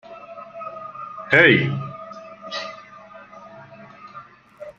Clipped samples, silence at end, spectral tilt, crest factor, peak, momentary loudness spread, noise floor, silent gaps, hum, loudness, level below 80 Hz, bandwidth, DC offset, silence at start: under 0.1%; 0.05 s; -6 dB/octave; 24 dB; -2 dBFS; 28 LU; -44 dBFS; none; none; -18 LUFS; -64 dBFS; 8 kHz; under 0.1%; 0.1 s